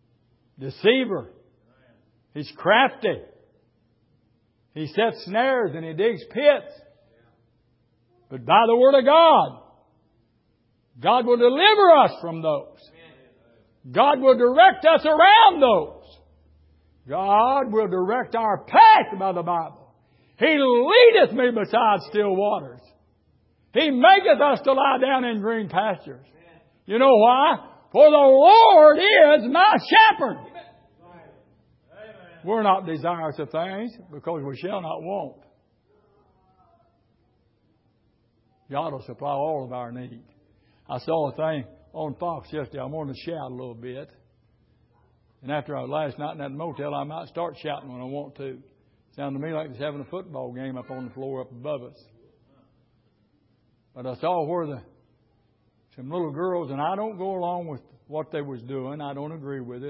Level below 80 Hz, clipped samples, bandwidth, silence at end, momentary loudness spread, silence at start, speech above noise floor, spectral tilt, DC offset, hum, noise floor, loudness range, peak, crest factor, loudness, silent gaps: -64 dBFS; under 0.1%; 5.8 kHz; 0 s; 22 LU; 0.6 s; 46 dB; -9.5 dB/octave; under 0.1%; none; -66 dBFS; 18 LU; -2 dBFS; 20 dB; -19 LUFS; none